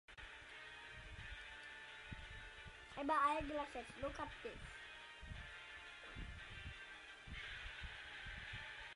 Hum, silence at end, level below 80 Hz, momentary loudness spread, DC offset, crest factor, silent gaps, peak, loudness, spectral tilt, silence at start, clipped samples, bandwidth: none; 0 s; -60 dBFS; 13 LU; under 0.1%; 22 dB; none; -26 dBFS; -48 LUFS; -4.5 dB/octave; 0.1 s; under 0.1%; 11.5 kHz